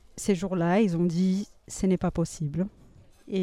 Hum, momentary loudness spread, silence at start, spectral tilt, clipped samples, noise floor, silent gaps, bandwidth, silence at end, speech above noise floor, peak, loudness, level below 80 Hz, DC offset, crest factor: none; 9 LU; 0.15 s; -6.5 dB/octave; under 0.1%; -52 dBFS; none; 13 kHz; 0 s; 27 dB; -12 dBFS; -27 LUFS; -50 dBFS; under 0.1%; 16 dB